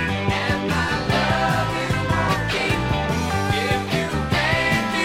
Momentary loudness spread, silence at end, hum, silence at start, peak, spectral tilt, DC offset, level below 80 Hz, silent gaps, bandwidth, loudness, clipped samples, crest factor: 3 LU; 0 s; none; 0 s; -6 dBFS; -5 dB/octave; under 0.1%; -36 dBFS; none; 16.5 kHz; -21 LUFS; under 0.1%; 14 dB